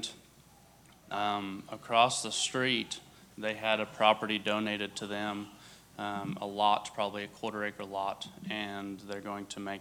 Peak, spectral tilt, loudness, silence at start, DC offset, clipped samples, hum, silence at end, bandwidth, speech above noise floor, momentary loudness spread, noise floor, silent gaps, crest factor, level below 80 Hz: -8 dBFS; -3 dB/octave; -33 LUFS; 0 s; under 0.1%; under 0.1%; none; 0 s; 18.5 kHz; 26 dB; 14 LU; -59 dBFS; none; 26 dB; -72 dBFS